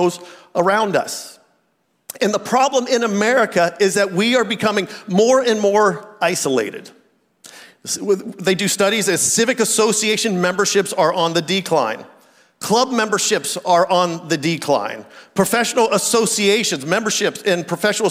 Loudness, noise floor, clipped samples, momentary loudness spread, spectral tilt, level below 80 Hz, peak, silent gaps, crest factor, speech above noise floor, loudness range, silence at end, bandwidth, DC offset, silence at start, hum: -17 LUFS; -65 dBFS; under 0.1%; 8 LU; -3 dB/octave; -66 dBFS; -4 dBFS; none; 14 dB; 48 dB; 3 LU; 0 s; 16 kHz; under 0.1%; 0 s; none